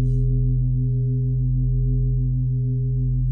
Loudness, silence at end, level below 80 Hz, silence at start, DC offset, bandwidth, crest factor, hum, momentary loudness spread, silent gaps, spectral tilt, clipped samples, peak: -22 LUFS; 0 s; -26 dBFS; 0 s; under 0.1%; 0.6 kHz; 8 dB; none; 2 LU; none; -14.5 dB/octave; under 0.1%; -12 dBFS